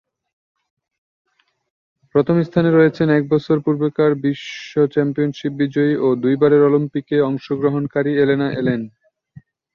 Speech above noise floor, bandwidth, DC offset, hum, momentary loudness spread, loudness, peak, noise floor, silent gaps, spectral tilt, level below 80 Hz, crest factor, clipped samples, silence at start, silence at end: 30 dB; 6.8 kHz; under 0.1%; none; 8 LU; -17 LUFS; -2 dBFS; -46 dBFS; none; -8.5 dB/octave; -58 dBFS; 16 dB; under 0.1%; 2.15 s; 0.85 s